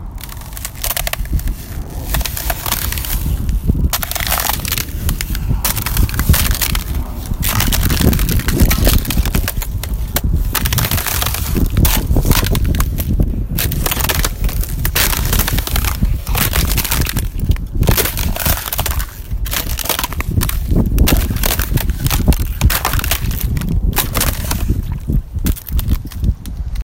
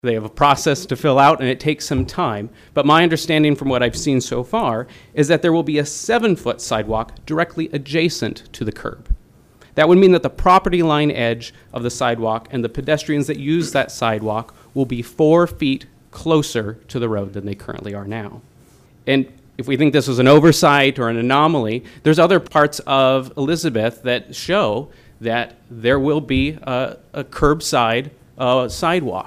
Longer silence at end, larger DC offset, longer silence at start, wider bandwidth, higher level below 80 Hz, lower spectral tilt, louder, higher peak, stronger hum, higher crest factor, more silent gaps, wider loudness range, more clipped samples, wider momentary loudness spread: about the same, 0 s vs 0 s; neither; about the same, 0 s vs 0.05 s; about the same, 17 kHz vs 15.5 kHz; first, -18 dBFS vs -38 dBFS; second, -4 dB/octave vs -5.5 dB/octave; about the same, -17 LUFS vs -17 LUFS; about the same, 0 dBFS vs -2 dBFS; neither; about the same, 16 dB vs 16 dB; neither; second, 3 LU vs 6 LU; neither; second, 7 LU vs 14 LU